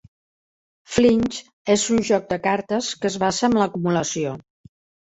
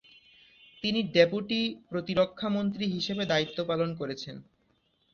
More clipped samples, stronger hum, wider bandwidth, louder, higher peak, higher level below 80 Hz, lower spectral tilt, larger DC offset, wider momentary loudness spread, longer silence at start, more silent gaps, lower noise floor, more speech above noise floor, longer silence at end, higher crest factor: neither; neither; first, 8.2 kHz vs 7.2 kHz; first, -21 LUFS vs -29 LUFS; about the same, -4 dBFS vs -6 dBFS; first, -52 dBFS vs -64 dBFS; about the same, -4.5 dB/octave vs -5.5 dB/octave; neither; second, 9 LU vs 12 LU; about the same, 0.9 s vs 0.85 s; first, 1.53-1.65 s vs none; first, under -90 dBFS vs -71 dBFS; first, over 70 dB vs 42 dB; about the same, 0.65 s vs 0.7 s; second, 18 dB vs 24 dB